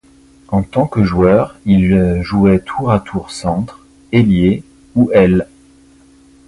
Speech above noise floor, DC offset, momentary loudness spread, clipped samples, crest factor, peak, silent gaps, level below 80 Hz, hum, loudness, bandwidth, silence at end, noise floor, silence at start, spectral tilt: 33 dB; under 0.1%; 10 LU; under 0.1%; 14 dB; 0 dBFS; none; -34 dBFS; none; -14 LUFS; 11 kHz; 1.05 s; -46 dBFS; 0.5 s; -8 dB/octave